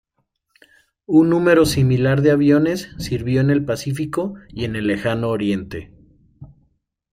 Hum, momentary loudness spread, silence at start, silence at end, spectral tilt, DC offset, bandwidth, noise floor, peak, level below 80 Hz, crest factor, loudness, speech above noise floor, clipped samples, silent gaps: none; 12 LU; 1.1 s; 0.65 s; -7 dB/octave; under 0.1%; 16 kHz; -71 dBFS; -4 dBFS; -46 dBFS; 16 dB; -18 LUFS; 54 dB; under 0.1%; none